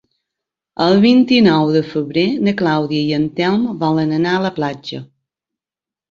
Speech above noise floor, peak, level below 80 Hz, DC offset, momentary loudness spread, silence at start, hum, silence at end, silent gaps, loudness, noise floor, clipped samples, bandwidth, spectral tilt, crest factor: 75 dB; -2 dBFS; -56 dBFS; under 0.1%; 12 LU; 0.8 s; none; 1.05 s; none; -15 LUFS; -89 dBFS; under 0.1%; 7.4 kHz; -7 dB/octave; 14 dB